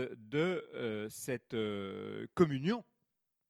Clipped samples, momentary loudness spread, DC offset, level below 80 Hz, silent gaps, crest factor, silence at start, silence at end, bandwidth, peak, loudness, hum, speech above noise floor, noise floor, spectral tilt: under 0.1%; 10 LU; under 0.1%; -70 dBFS; none; 22 dB; 0 s; 0.7 s; 15.5 kHz; -16 dBFS; -37 LUFS; none; 48 dB; -84 dBFS; -6 dB/octave